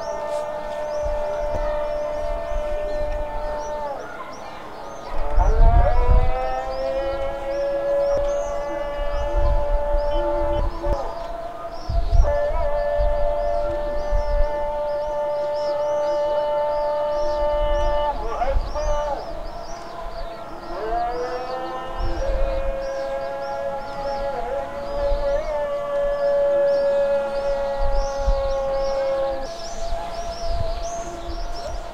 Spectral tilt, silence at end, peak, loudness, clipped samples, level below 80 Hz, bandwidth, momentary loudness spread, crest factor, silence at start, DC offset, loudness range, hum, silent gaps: -6 dB/octave; 0 s; -4 dBFS; -25 LUFS; under 0.1%; -26 dBFS; 8.4 kHz; 11 LU; 18 dB; 0 s; 1%; 6 LU; none; none